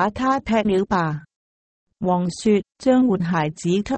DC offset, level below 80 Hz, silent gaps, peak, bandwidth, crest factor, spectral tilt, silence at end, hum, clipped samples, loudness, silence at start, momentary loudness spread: under 0.1%; -48 dBFS; 1.36-1.87 s; -6 dBFS; 8.8 kHz; 16 dB; -6.5 dB/octave; 0 s; none; under 0.1%; -21 LUFS; 0 s; 5 LU